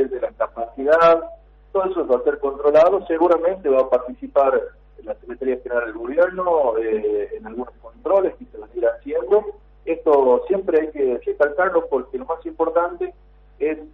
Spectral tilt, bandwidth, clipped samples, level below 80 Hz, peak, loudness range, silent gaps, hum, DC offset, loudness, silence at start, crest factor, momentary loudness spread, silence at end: -7 dB/octave; 6.2 kHz; under 0.1%; -50 dBFS; -6 dBFS; 4 LU; none; 50 Hz at -50 dBFS; under 0.1%; -20 LUFS; 0 s; 14 dB; 16 LU; 0.05 s